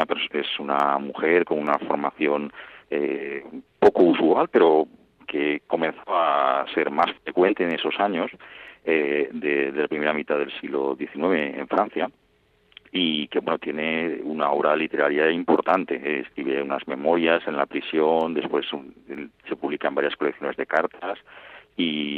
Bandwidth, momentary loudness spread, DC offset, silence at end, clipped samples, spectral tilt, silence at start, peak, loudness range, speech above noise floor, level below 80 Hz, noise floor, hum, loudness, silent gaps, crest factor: 5.8 kHz; 12 LU; under 0.1%; 0 s; under 0.1%; -7 dB/octave; 0 s; -6 dBFS; 5 LU; 39 dB; -68 dBFS; -63 dBFS; none; -23 LUFS; none; 18 dB